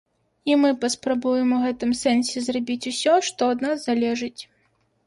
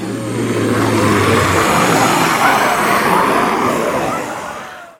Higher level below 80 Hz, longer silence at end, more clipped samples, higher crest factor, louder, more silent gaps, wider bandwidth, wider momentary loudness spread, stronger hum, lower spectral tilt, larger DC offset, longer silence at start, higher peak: second, -62 dBFS vs -44 dBFS; first, 0.65 s vs 0.1 s; neither; about the same, 16 dB vs 14 dB; second, -22 LUFS vs -13 LUFS; neither; second, 11.5 kHz vs 18 kHz; about the same, 7 LU vs 9 LU; neither; second, -3 dB/octave vs -4.5 dB/octave; neither; first, 0.45 s vs 0 s; second, -8 dBFS vs 0 dBFS